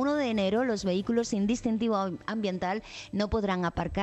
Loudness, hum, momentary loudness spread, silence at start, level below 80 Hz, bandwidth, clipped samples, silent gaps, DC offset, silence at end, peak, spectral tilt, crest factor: -29 LUFS; none; 5 LU; 0 s; -48 dBFS; 8.6 kHz; under 0.1%; none; under 0.1%; 0 s; -14 dBFS; -5.5 dB/octave; 14 dB